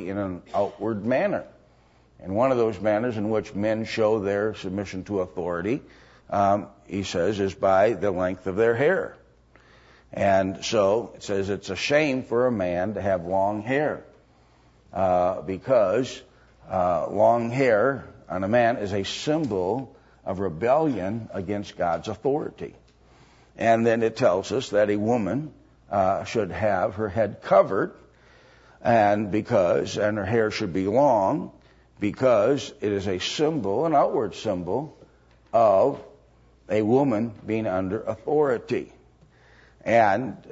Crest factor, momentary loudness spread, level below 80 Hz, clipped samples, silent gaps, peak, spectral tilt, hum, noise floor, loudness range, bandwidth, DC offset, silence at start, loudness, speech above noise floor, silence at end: 20 dB; 10 LU; -58 dBFS; under 0.1%; none; -6 dBFS; -6 dB/octave; none; -58 dBFS; 3 LU; 8 kHz; under 0.1%; 0 s; -24 LUFS; 34 dB; 0.05 s